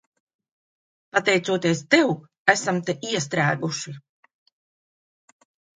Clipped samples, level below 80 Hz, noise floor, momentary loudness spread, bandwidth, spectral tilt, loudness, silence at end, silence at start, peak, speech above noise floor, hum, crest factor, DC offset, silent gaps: under 0.1%; -70 dBFS; under -90 dBFS; 9 LU; 9.6 kHz; -4 dB/octave; -22 LUFS; 1.8 s; 1.15 s; -2 dBFS; over 68 dB; none; 24 dB; under 0.1%; 2.37-2.45 s